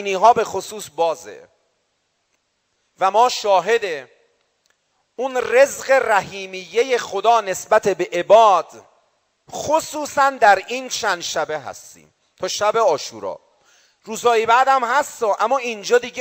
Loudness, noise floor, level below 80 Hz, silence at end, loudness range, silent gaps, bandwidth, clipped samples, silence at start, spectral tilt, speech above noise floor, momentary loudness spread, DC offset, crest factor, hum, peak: -18 LUFS; -69 dBFS; -64 dBFS; 0 s; 5 LU; none; 16 kHz; under 0.1%; 0 s; -2 dB/octave; 51 dB; 15 LU; under 0.1%; 18 dB; none; -2 dBFS